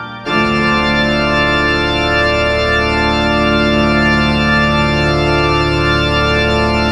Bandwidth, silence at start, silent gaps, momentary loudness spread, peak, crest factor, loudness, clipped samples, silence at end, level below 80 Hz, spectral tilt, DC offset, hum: 12 kHz; 0 s; none; 1 LU; -2 dBFS; 12 dB; -12 LUFS; under 0.1%; 0 s; -24 dBFS; -6 dB/octave; under 0.1%; none